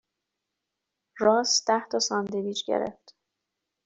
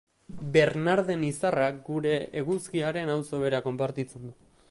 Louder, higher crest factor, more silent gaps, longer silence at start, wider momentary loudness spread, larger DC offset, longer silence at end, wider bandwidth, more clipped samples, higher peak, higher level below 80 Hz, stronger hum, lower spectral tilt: about the same, -26 LUFS vs -28 LUFS; about the same, 20 dB vs 20 dB; neither; first, 1.15 s vs 0.3 s; second, 8 LU vs 12 LU; neither; first, 0.95 s vs 0.4 s; second, 8.2 kHz vs 11.5 kHz; neither; about the same, -8 dBFS vs -8 dBFS; second, -72 dBFS vs -62 dBFS; neither; second, -2.5 dB/octave vs -6 dB/octave